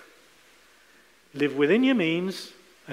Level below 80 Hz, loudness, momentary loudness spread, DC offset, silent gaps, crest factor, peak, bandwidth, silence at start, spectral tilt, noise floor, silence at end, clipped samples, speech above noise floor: -76 dBFS; -24 LUFS; 20 LU; under 0.1%; none; 16 dB; -10 dBFS; 15 kHz; 1.35 s; -6 dB/octave; -58 dBFS; 0 s; under 0.1%; 34 dB